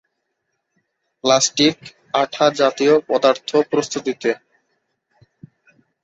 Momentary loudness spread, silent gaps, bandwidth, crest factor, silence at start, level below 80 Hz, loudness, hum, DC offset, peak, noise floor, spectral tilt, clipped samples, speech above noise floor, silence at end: 9 LU; none; 8.2 kHz; 18 dB; 1.25 s; -64 dBFS; -18 LUFS; none; under 0.1%; -2 dBFS; -74 dBFS; -3 dB/octave; under 0.1%; 57 dB; 1.65 s